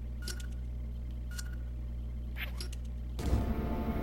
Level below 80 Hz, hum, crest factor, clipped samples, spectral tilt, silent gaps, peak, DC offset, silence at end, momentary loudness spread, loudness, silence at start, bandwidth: -38 dBFS; 60 Hz at -40 dBFS; 18 dB; under 0.1%; -6 dB/octave; none; -18 dBFS; under 0.1%; 0 s; 8 LU; -39 LUFS; 0 s; 16.5 kHz